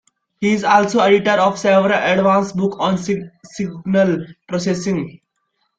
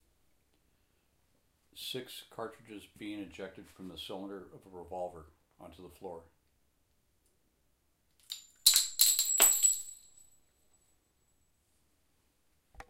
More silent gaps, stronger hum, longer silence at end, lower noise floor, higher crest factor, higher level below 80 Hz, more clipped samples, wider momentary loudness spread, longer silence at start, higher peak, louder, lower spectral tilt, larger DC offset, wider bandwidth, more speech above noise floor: neither; neither; first, 0.6 s vs 0.1 s; second, -69 dBFS vs -75 dBFS; second, 16 dB vs 36 dB; first, -56 dBFS vs -70 dBFS; neither; second, 12 LU vs 25 LU; second, 0.4 s vs 1.75 s; about the same, 0 dBFS vs -2 dBFS; first, -17 LUFS vs -26 LUFS; first, -5.5 dB/octave vs 0.5 dB/octave; neither; second, 9 kHz vs 16 kHz; first, 53 dB vs 30 dB